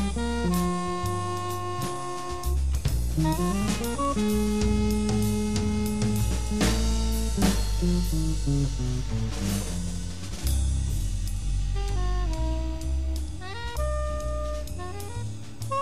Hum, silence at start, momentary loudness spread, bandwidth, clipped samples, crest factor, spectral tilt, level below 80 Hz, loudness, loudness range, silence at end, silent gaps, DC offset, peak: none; 0 s; 8 LU; 15.5 kHz; under 0.1%; 18 dB; -5.5 dB/octave; -30 dBFS; -28 LUFS; 5 LU; 0 s; none; 1%; -10 dBFS